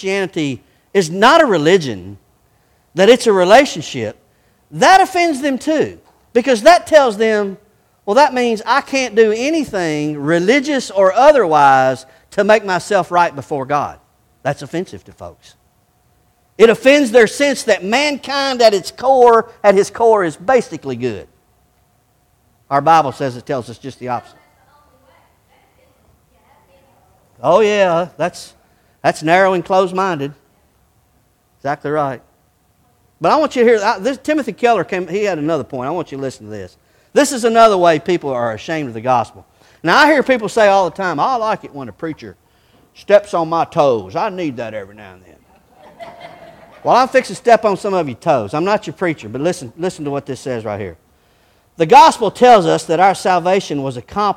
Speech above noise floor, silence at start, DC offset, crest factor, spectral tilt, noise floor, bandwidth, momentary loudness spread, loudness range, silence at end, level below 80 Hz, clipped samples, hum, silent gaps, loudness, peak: 44 dB; 0 s; under 0.1%; 16 dB; -4.5 dB/octave; -57 dBFS; 16 kHz; 15 LU; 8 LU; 0 s; -54 dBFS; 0.2%; none; none; -14 LUFS; 0 dBFS